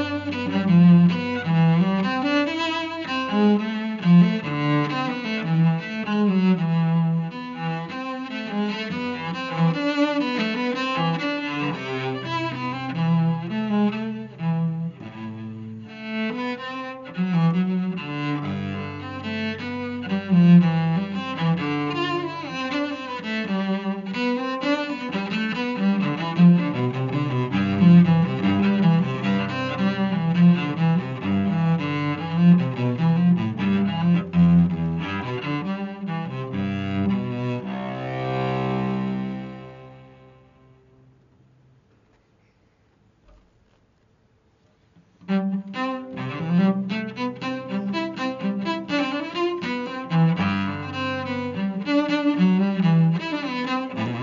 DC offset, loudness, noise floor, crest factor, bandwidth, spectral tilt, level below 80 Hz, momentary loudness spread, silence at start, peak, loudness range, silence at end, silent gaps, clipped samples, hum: under 0.1%; -23 LUFS; -61 dBFS; 18 dB; 7 kHz; -6.5 dB/octave; -58 dBFS; 12 LU; 0 s; -6 dBFS; 8 LU; 0 s; none; under 0.1%; none